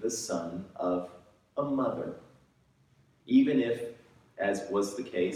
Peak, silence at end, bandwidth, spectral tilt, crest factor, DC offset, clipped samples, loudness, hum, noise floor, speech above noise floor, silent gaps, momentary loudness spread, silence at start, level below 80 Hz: -14 dBFS; 0 s; 14 kHz; -5 dB/octave; 18 dB; under 0.1%; under 0.1%; -31 LUFS; none; -66 dBFS; 37 dB; none; 15 LU; 0 s; -70 dBFS